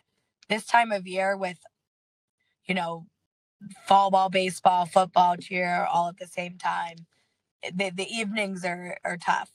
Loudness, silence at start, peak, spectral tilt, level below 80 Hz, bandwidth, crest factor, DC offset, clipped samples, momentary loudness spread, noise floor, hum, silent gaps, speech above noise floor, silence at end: -26 LUFS; 0.5 s; -4 dBFS; -4 dB/octave; -78 dBFS; 13.5 kHz; 22 dB; under 0.1%; under 0.1%; 13 LU; -63 dBFS; none; 1.87-2.38 s, 3.26-3.60 s, 7.51-7.60 s; 37 dB; 0.1 s